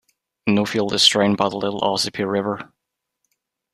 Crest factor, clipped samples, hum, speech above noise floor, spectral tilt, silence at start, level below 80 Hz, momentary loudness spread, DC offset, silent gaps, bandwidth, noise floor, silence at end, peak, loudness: 20 dB; under 0.1%; none; 61 dB; -3.5 dB/octave; 0.45 s; -60 dBFS; 11 LU; under 0.1%; none; 14.5 kHz; -81 dBFS; 1.1 s; -2 dBFS; -19 LUFS